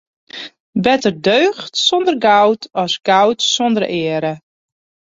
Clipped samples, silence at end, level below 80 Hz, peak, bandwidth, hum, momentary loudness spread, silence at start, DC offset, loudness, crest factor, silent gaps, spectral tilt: under 0.1%; 0.75 s; -58 dBFS; 0 dBFS; 8 kHz; none; 16 LU; 0.35 s; under 0.1%; -15 LUFS; 16 dB; 0.60-0.73 s; -3.5 dB/octave